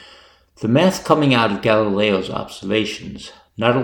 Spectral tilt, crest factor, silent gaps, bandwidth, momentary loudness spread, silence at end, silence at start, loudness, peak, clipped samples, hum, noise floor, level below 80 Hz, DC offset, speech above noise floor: -5.5 dB/octave; 18 dB; none; 18.5 kHz; 15 LU; 0 s; 0 s; -18 LUFS; 0 dBFS; under 0.1%; none; -48 dBFS; -52 dBFS; under 0.1%; 31 dB